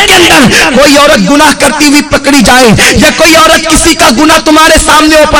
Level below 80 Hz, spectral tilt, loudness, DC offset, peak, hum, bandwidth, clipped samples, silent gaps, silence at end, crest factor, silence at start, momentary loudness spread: -22 dBFS; -3 dB/octave; -2 LUFS; under 0.1%; 0 dBFS; none; 16 kHz; 40%; none; 0 s; 2 dB; 0 s; 3 LU